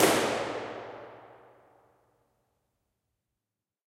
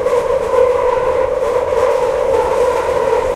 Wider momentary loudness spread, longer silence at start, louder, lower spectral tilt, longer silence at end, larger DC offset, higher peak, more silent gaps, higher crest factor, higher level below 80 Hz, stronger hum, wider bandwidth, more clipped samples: first, 23 LU vs 2 LU; about the same, 0 s vs 0 s; second, -30 LUFS vs -15 LUFS; second, -3 dB/octave vs -4.5 dB/octave; first, 2.6 s vs 0 s; neither; second, -8 dBFS vs -2 dBFS; neither; first, 26 dB vs 12 dB; second, -70 dBFS vs -36 dBFS; neither; first, 16 kHz vs 13 kHz; neither